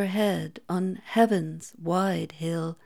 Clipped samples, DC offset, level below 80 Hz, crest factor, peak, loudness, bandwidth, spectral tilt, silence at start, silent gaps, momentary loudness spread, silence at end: under 0.1%; 0.1%; -74 dBFS; 18 dB; -8 dBFS; -27 LUFS; 17 kHz; -6.5 dB/octave; 0 s; none; 9 LU; 0.1 s